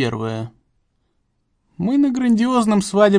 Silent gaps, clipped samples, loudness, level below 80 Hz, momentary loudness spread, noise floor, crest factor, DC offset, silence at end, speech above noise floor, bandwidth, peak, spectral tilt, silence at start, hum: none; under 0.1%; -18 LUFS; -56 dBFS; 12 LU; -67 dBFS; 18 dB; under 0.1%; 0 s; 50 dB; 10.5 kHz; -2 dBFS; -6 dB/octave; 0 s; none